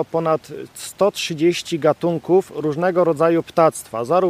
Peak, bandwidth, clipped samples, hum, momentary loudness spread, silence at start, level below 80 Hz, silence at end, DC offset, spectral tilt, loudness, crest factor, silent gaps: -2 dBFS; 15.5 kHz; under 0.1%; none; 8 LU; 0 s; -62 dBFS; 0 s; under 0.1%; -5.5 dB/octave; -19 LUFS; 18 dB; none